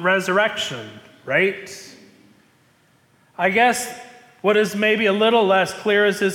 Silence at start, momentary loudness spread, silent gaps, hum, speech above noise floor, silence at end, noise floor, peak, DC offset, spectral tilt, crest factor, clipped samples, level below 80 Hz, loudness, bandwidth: 0 s; 19 LU; none; none; 39 dB; 0 s; -58 dBFS; -6 dBFS; under 0.1%; -4 dB/octave; 14 dB; under 0.1%; -66 dBFS; -19 LUFS; 17.5 kHz